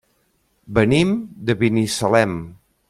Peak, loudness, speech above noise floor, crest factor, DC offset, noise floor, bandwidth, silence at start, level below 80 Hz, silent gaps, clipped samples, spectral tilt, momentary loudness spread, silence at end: -2 dBFS; -19 LUFS; 46 dB; 18 dB; under 0.1%; -65 dBFS; 15.5 kHz; 0.7 s; -46 dBFS; none; under 0.1%; -5.5 dB/octave; 7 LU; 0.35 s